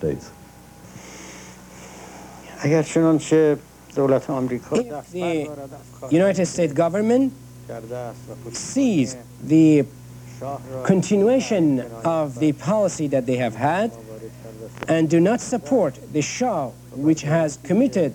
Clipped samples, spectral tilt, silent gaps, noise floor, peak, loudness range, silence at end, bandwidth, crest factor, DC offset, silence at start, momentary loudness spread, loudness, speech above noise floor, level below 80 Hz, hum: under 0.1%; -6.5 dB/octave; none; -44 dBFS; -4 dBFS; 3 LU; 0 s; 18.5 kHz; 18 dB; under 0.1%; 0 s; 21 LU; -21 LUFS; 24 dB; -54 dBFS; none